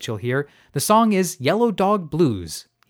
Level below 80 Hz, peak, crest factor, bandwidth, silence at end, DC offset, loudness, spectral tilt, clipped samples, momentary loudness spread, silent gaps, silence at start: -54 dBFS; -4 dBFS; 16 dB; 19 kHz; 0.25 s; under 0.1%; -20 LUFS; -5 dB/octave; under 0.1%; 12 LU; none; 0 s